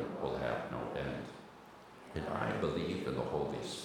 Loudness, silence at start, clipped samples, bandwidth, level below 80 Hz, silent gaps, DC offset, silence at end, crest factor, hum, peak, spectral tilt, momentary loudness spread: -38 LUFS; 0 s; under 0.1%; 18.5 kHz; -60 dBFS; none; under 0.1%; 0 s; 20 dB; none; -20 dBFS; -6 dB/octave; 18 LU